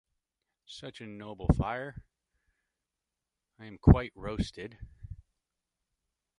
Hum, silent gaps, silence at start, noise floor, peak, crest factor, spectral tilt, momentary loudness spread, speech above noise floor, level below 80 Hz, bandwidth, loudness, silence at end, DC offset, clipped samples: none; none; 0.7 s; -88 dBFS; -4 dBFS; 30 dB; -8 dB/octave; 26 LU; 59 dB; -40 dBFS; 10.5 kHz; -29 LUFS; 1.25 s; under 0.1%; under 0.1%